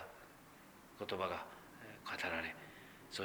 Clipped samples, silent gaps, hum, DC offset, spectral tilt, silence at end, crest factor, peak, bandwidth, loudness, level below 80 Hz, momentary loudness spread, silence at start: under 0.1%; none; none; under 0.1%; -3.5 dB/octave; 0 s; 22 dB; -24 dBFS; over 20 kHz; -44 LUFS; -72 dBFS; 19 LU; 0 s